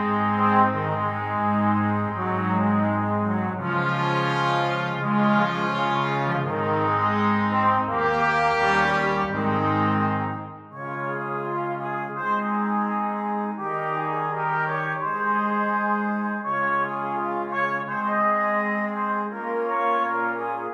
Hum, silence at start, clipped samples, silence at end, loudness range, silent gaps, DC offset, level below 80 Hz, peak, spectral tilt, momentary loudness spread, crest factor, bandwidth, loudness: none; 0 s; under 0.1%; 0 s; 4 LU; none; under 0.1%; -58 dBFS; -6 dBFS; -7 dB/octave; 7 LU; 18 dB; 8.4 kHz; -24 LUFS